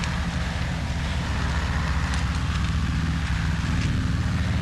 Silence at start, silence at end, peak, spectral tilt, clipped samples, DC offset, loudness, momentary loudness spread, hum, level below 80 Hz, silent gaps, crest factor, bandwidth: 0 s; 0 s; -10 dBFS; -5.5 dB/octave; under 0.1%; under 0.1%; -26 LUFS; 3 LU; none; -28 dBFS; none; 14 dB; 12 kHz